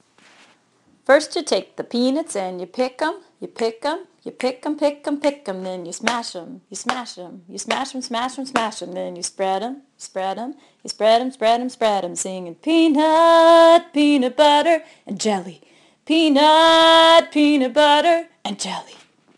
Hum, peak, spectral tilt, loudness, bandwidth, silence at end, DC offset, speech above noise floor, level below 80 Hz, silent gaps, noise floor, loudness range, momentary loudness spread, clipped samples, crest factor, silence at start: none; 0 dBFS; -3 dB/octave; -18 LUFS; 12 kHz; 0.45 s; under 0.1%; 41 dB; -66 dBFS; none; -59 dBFS; 11 LU; 20 LU; under 0.1%; 18 dB; 1.1 s